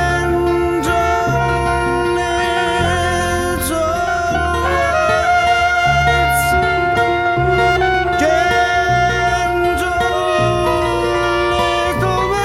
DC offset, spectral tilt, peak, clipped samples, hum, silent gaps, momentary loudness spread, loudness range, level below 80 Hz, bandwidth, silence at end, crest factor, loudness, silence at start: under 0.1%; -5 dB/octave; -4 dBFS; under 0.1%; none; none; 3 LU; 2 LU; -30 dBFS; 16 kHz; 0 s; 12 dB; -15 LUFS; 0 s